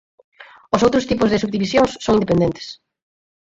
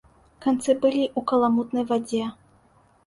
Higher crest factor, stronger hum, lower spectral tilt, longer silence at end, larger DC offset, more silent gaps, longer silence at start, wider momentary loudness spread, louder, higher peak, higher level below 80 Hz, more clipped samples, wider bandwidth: about the same, 18 dB vs 16 dB; neither; about the same, -6 dB/octave vs -5.5 dB/octave; about the same, 0.65 s vs 0.75 s; neither; neither; about the same, 0.4 s vs 0.4 s; about the same, 6 LU vs 8 LU; first, -18 LUFS vs -24 LUFS; first, -2 dBFS vs -8 dBFS; first, -46 dBFS vs -62 dBFS; neither; second, 7.8 kHz vs 11.5 kHz